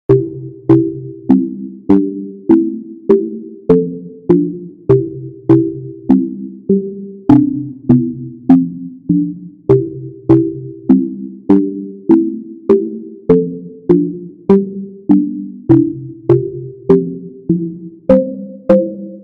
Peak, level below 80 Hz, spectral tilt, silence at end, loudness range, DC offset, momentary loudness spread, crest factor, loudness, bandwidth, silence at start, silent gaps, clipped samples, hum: 0 dBFS; -46 dBFS; -11.5 dB/octave; 0 s; 1 LU; under 0.1%; 12 LU; 14 dB; -14 LUFS; 4.5 kHz; 0.1 s; none; 0.1%; none